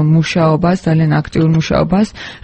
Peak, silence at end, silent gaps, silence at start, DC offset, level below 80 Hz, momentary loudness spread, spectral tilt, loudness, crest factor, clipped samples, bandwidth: 0 dBFS; 0.05 s; none; 0 s; under 0.1%; -36 dBFS; 2 LU; -7.5 dB/octave; -13 LUFS; 12 dB; under 0.1%; 8.6 kHz